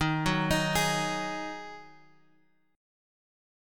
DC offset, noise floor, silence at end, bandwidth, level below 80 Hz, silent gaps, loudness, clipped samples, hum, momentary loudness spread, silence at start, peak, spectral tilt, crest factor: under 0.1%; -69 dBFS; 0.95 s; 17.5 kHz; -50 dBFS; none; -29 LUFS; under 0.1%; none; 17 LU; 0 s; -12 dBFS; -4 dB/octave; 20 dB